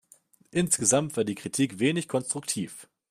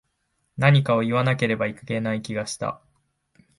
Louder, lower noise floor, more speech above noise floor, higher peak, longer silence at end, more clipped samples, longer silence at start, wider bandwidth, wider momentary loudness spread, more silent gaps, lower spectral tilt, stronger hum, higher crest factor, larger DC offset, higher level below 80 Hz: second, -27 LUFS vs -23 LUFS; second, -60 dBFS vs -73 dBFS; second, 33 dB vs 51 dB; second, -8 dBFS vs -4 dBFS; second, 0.25 s vs 0.85 s; neither; about the same, 0.55 s vs 0.55 s; first, 15.5 kHz vs 11.5 kHz; about the same, 10 LU vs 12 LU; neither; second, -4 dB/octave vs -6 dB/octave; neither; about the same, 20 dB vs 20 dB; neither; second, -66 dBFS vs -60 dBFS